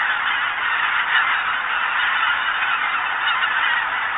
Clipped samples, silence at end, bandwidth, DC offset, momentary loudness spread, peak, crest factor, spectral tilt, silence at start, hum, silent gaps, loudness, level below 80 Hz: under 0.1%; 0 s; 4.1 kHz; under 0.1%; 3 LU; -6 dBFS; 16 dB; 4 dB/octave; 0 s; none; none; -19 LUFS; -58 dBFS